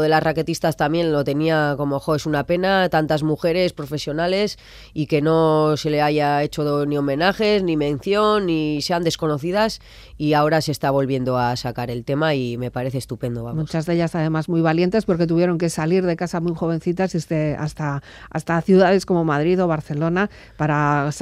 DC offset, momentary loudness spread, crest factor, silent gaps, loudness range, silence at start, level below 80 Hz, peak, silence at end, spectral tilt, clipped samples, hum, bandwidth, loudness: under 0.1%; 8 LU; 16 dB; none; 3 LU; 0 s; -48 dBFS; -4 dBFS; 0 s; -6.5 dB/octave; under 0.1%; none; 15 kHz; -20 LUFS